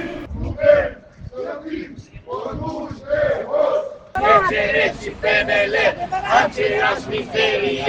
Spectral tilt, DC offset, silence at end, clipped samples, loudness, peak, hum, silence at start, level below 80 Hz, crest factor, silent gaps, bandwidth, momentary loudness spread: -4.5 dB/octave; under 0.1%; 0 s; under 0.1%; -19 LUFS; 0 dBFS; none; 0 s; -40 dBFS; 20 dB; none; 8.8 kHz; 15 LU